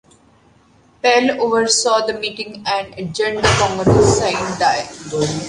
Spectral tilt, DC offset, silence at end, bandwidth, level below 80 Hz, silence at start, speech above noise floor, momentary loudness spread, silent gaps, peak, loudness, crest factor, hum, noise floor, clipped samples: -4 dB/octave; under 0.1%; 0 s; 11.5 kHz; -38 dBFS; 1.05 s; 35 dB; 10 LU; none; 0 dBFS; -16 LUFS; 18 dB; none; -52 dBFS; under 0.1%